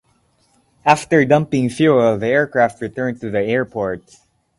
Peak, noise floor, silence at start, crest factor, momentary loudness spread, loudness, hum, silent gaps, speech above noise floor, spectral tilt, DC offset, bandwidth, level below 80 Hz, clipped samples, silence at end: 0 dBFS; -60 dBFS; 0.85 s; 18 dB; 10 LU; -17 LUFS; none; none; 44 dB; -6.5 dB/octave; under 0.1%; 11.5 kHz; -52 dBFS; under 0.1%; 0.6 s